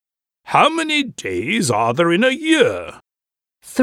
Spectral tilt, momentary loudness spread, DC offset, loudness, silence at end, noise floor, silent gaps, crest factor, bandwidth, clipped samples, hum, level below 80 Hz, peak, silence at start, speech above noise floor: -4 dB/octave; 10 LU; under 0.1%; -17 LUFS; 0 s; -89 dBFS; none; 18 dB; 15 kHz; under 0.1%; none; -60 dBFS; 0 dBFS; 0.45 s; 72 dB